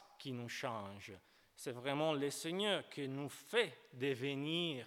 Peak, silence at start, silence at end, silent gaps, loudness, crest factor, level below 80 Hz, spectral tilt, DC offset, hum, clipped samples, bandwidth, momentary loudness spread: -20 dBFS; 0 s; 0 s; none; -40 LUFS; 20 dB; -88 dBFS; -4.5 dB/octave; under 0.1%; none; under 0.1%; 18 kHz; 12 LU